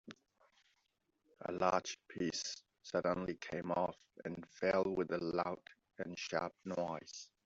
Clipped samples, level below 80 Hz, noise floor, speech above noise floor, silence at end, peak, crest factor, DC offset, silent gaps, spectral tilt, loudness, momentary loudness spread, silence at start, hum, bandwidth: under 0.1%; -74 dBFS; -82 dBFS; 43 dB; 0.2 s; -18 dBFS; 24 dB; under 0.1%; none; -4 dB/octave; -40 LUFS; 14 LU; 0.05 s; none; 8 kHz